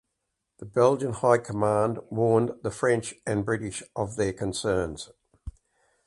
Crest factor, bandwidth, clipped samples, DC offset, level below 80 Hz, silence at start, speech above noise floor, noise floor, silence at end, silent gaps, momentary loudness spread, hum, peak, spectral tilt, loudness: 20 dB; 11.5 kHz; under 0.1%; under 0.1%; -52 dBFS; 0.6 s; 55 dB; -81 dBFS; 0.55 s; none; 20 LU; none; -6 dBFS; -6 dB/octave; -26 LUFS